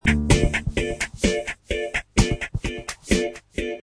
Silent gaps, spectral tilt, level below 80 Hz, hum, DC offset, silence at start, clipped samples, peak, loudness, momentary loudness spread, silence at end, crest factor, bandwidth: none; -4.5 dB/octave; -30 dBFS; none; under 0.1%; 0.05 s; under 0.1%; -4 dBFS; -24 LUFS; 10 LU; 0 s; 20 dB; 11 kHz